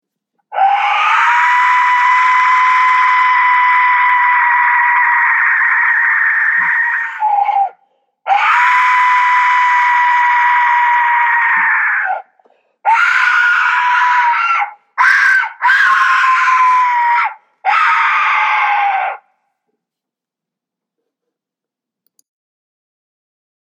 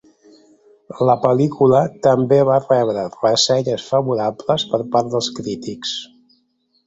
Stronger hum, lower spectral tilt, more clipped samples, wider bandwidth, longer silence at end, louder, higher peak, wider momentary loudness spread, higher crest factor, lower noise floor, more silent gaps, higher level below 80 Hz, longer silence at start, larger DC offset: neither; second, 1.5 dB/octave vs -5 dB/octave; neither; first, 9.2 kHz vs 8.2 kHz; first, 4.55 s vs 0.8 s; first, -11 LUFS vs -17 LUFS; about the same, 0 dBFS vs 0 dBFS; second, 6 LU vs 11 LU; second, 12 dB vs 18 dB; first, -84 dBFS vs -64 dBFS; neither; second, -80 dBFS vs -58 dBFS; second, 0.5 s vs 0.9 s; neither